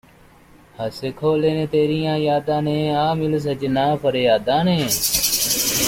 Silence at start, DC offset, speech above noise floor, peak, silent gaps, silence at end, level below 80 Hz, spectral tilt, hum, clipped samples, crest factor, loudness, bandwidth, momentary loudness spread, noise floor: 0.8 s; under 0.1%; 30 dB; -4 dBFS; none; 0 s; -48 dBFS; -4 dB/octave; none; under 0.1%; 16 dB; -19 LUFS; 16.5 kHz; 6 LU; -49 dBFS